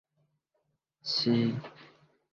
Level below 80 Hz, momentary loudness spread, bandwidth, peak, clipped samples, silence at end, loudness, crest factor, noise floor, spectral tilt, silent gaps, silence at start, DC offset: -72 dBFS; 15 LU; 7.2 kHz; -16 dBFS; under 0.1%; 0.45 s; -29 LUFS; 18 dB; -79 dBFS; -6 dB/octave; none; 1.05 s; under 0.1%